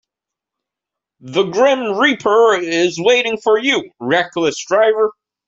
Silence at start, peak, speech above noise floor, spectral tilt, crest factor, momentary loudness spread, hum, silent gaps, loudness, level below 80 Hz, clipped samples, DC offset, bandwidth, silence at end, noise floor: 1.25 s; -2 dBFS; 70 dB; -3.5 dB/octave; 16 dB; 6 LU; none; none; -15 LUFS; -62 dBFS; under 0.1%; under 0.1%; 7.8 kHz; 0.35 s; -84 dBFS